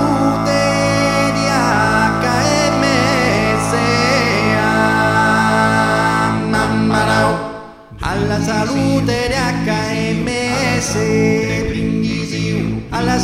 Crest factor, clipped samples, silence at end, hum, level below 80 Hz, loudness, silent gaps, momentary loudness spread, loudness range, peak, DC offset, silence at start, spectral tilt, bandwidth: 14 dB; under 0.1%; 0 s; none; -34 dBFS; -15 LUFS; none; 5 LU; 4 LU; 0 dBFS; under 0.1%; 0 s; -5 dB/octave; 15 kHz